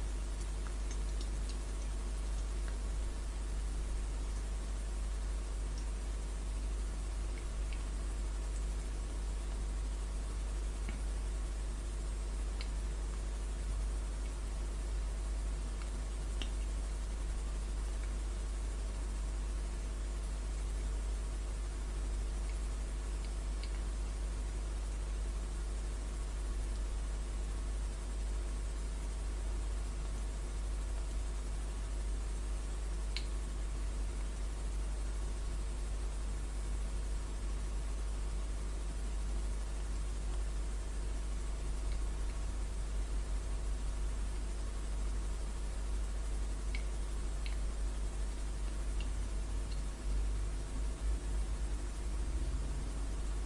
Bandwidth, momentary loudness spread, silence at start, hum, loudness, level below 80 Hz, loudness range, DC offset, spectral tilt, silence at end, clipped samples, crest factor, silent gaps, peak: 11.5 kHz; 2 LU; 0 s; none; -41 LUFS; -38 dBFS; 1 LU; under 0.1%; -5 dB/octave; 0 s; under 0.1%; 16 dB; none; -22 dBFS